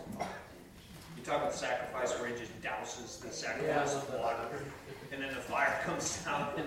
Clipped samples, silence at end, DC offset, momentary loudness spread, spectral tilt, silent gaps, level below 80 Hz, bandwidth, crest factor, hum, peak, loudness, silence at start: under 0.1%; 0 s; under 0.1%; 15 LU; -3.5 dB/octave; none; -62 dBFS; 16 kHz; 20 dB; none; -18 dBFS; -36 LUFS; 0 s